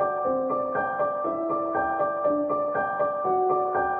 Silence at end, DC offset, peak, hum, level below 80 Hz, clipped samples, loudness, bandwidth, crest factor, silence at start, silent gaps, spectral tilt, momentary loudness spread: 0 s; under 0.1%; -14 dBFS; none; -60 dBFS; under 0.1%; -26 LUFS; 3.6 kHz; 12 dB; 0 s; none; -10 dB/octave; 3 LU